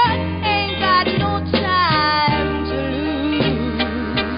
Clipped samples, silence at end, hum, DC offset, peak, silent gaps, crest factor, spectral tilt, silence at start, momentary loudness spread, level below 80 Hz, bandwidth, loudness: under 0.1%; 0 s; none; under 0.1%; -2 dBFS; none; 16 dB; -10.5 dB/octave; 0 s; 6 LU; -32 dBFS; 5.4 kHz; -18 LUFS